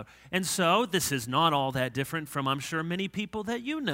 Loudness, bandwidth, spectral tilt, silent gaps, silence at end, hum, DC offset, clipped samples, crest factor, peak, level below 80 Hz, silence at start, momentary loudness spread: -29 LUFS; 16 kHz; -4 dB/octave; none; 0 s; none; under 0.1%; under 0.1%; 18 dB; -10 dBFS; -62 dBFS; 0 s; 8 LU